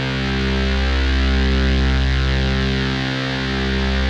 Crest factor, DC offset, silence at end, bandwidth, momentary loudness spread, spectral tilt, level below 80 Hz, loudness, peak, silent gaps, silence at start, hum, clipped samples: 12 dB; under 0.1%; 0 s; 7.8 kHz; 3 LU; -6 dB/octave; -20 dBFS; -19 LUFS; -6 dBFS; none; 0 s; none; under 0.1%